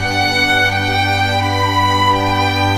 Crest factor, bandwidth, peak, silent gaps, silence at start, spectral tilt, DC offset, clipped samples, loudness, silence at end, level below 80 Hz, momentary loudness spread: 12 dB; 15.5 kHz; -4 dBFS; none; 0 s; -4.5 dB/octave; 0.3%; under 0.1%; -14 LUFS; 0 s; -38 dBFS; 3 LU